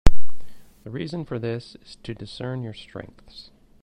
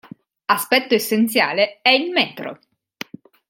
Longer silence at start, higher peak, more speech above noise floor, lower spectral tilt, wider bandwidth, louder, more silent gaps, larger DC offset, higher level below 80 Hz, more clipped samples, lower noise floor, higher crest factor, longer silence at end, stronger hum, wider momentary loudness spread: second, 0.05 s vs 0.5 s; about the same, 0 dBFS vs 0 dBFS; second, -1 dB vs 19 dB; first, -6.5 dB/octave vs -3 dB/octave; second, 9.2 kHz vs 17 kHz; second, -32 LUFS vs -18 LUFS; neither; neither; first, -30 dBFS vs -72 dBFS; first, 0.2% vs under 0.1%; second, -28 dBFS vs -38 dBFS; about the same, 18 dB vs 20 dB; second, 0 s vs 0.95 s; neither; second, 15 LU vs 20 LU